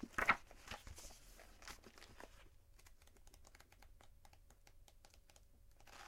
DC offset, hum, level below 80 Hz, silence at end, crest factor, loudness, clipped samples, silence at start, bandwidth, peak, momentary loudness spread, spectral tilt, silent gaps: under 0.1%; none; -64 dBFS; 0 s; 32 dB; -44 LUFS; under 0.1%; 0 s; 16.5 kHz; -18 dBFS; 28 LU; -3 dB/octave; none